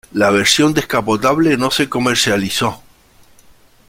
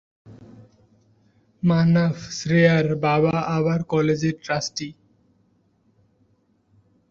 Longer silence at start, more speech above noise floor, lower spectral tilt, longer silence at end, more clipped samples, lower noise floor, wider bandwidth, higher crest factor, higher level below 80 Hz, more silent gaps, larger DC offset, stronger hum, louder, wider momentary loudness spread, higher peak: about the same, 0.15 s vs 0.25 s; second, 33 dB vs 44 dB; second, -3.5 dB/octave vs -6.5 dB/octave; second, 1.1 s vs 2.2 s; neither; second, -48 dBFS vs -64 dBFS; first, 16.5 kHz vs 7.4 kHz; about the same, 16 dB vs 20 dB; first, -48 dBFS vs -58 dBFS; neither; neither; neither; first, -14 LUFS vs -21 LUFS; second, 6 LU vs 10 LU; first, 0 dBFS vs -4 dBFS